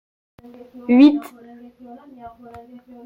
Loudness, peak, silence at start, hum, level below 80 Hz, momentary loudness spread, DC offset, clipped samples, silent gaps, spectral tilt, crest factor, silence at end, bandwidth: -15 LUFS; -2 dBFS; 0.9 s; none; -62 dBFS; 27 LU; under 0.1%; under 0.1%; none; -6 dB/octave; 18 dB; 0.8 s; 5 kHz